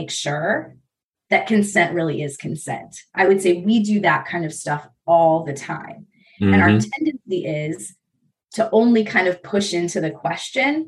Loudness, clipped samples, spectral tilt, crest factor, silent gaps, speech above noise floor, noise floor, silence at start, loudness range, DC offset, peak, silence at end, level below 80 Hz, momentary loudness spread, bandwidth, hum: -19 LUFS; under 0.1%; -5.5 dB/octave; 18 dB; 1.05-1.12 s; 50 dB; -69 dBFS; 0 s; 2 LU; under 0.1%; -2 dBFS; 0 s; -64 dBFS; 13 LU; 12.5 kHz; none